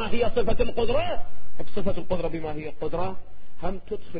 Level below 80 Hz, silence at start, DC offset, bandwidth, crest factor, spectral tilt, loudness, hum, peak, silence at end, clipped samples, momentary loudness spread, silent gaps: -36 dBFS; 0 s; under 0.1%; 4.9 kHz; 12 dB; -10.5 dB/octave; -29 LUFS; none; -8 dBFS; 0 s; under 0.1%; 11 LU; none